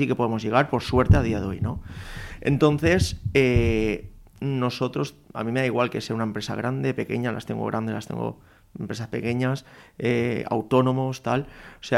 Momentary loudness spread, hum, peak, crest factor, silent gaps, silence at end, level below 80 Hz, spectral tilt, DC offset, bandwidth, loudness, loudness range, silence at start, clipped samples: 13 LU; none; -6 dBFS; 18 dB; none; 0 s; -38 dBFS; -6.5 dB/octave; under 0.1%; 14.5 kHz; -25 LUFS; 6 LU; 0 s; under 0.1%